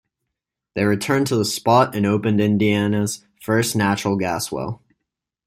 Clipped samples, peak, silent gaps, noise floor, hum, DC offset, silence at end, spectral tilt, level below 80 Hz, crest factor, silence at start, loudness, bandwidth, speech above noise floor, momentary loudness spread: under 0.1%; -2 dBFS; none; -82 dBFS; none; under 0.1%; 0.7 s; -5.5 dB/octave; -56 dBFS; 18 dB; 0.75 s; -20 LUFS; 16 kHz; 63 dB; 11 LU